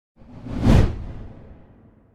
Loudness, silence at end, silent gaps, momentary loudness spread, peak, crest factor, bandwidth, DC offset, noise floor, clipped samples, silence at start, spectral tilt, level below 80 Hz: -20 LUFS; 0.45 s; none; 23 LU; -4 dBFS; 20 dB; 12 kHz; under 0.1%; -51 dBFS; under 0.1%; 0.3 s; -8 dB/octave; -28 dBFS